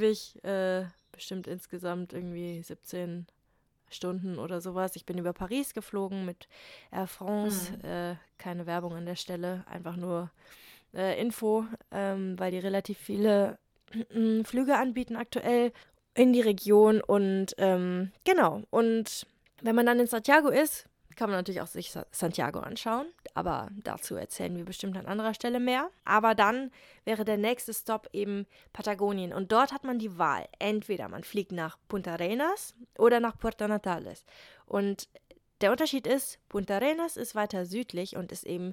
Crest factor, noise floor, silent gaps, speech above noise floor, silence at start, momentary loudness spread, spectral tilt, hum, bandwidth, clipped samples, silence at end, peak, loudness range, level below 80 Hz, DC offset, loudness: 24 dB; -72 dBFS; none; 42 dB; 0 s; 14 LU; -5 dB/octave; none; 18.5 kHz; under 0.1%; 0 s; -6 dBFS; 10 LU; -62 dBFS; under 0.1%; -30 LUFS